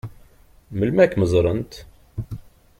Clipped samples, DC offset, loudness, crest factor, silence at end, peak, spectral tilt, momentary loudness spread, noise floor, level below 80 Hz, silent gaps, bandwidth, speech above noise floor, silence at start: under 0.1%; under 0.1%; -19 LUFS; 20 dB; 0.4 s; -2 dBFS; -7.5 dB/octave; 21 LU; -51 dBFS; -42 dBFS; none; 15 kHz; 32 dB; 0.05 s